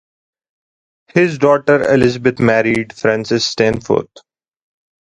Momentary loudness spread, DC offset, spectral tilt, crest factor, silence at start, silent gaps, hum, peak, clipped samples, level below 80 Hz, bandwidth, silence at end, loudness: 6 LU; under 0.1%; -5.5 dB/octave; 16 dB; 1.15 s; none; none; 0 dBFS; under 0.1%; -48 dBFS; 11 kHz; 1 s; -14 LUFS